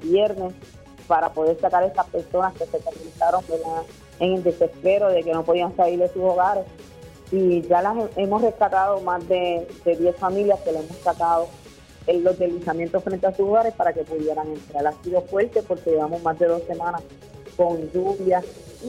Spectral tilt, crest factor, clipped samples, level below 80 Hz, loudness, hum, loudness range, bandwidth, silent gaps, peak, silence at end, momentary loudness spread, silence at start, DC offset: -6.5 dB/octave; 16 dB; under 0.1%; -52 dBFS; -22 LUFS; none; 2 LU; 13 kHz; none; -6 dBFS; 0 s; 8 LU; 0 s; under 0.1%